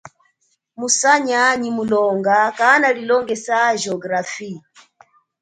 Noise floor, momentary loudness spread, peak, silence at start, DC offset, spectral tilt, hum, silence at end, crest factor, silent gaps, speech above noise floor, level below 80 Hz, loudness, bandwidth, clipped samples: -66 dBFS; 14 LU; 0 dBFS; 0.05 s; under 0.1%; -2.5 dB/octave; none; 0.85 s; 18 dB; none; 48 dB; -64 dBFS; -16 LUFS; 9.4 kHz; under 0.1%